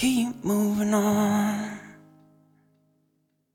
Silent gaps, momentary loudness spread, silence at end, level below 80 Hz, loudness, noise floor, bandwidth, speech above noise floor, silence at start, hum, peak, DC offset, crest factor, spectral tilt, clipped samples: none; 11 LU; 1.65 s; -60 dBFS; -25 LUFS; -72 dBFS; 17 kHz; 48 dB; 0 s; none; -12 dBFS; under 0.1%; 14 dB; -5 dB/octave; under 0.1%